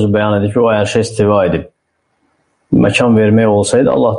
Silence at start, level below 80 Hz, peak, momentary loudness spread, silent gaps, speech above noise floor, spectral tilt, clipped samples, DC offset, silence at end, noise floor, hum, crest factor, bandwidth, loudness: 0 s; -42 dBFS; 0 dBFS; 5 LU; none; 54 dB; -6 dB/octave; under 0.1%; under 0.1%; 0 s; -65 dBFS; none; 12 dB; 11 kHz; -12 LUFS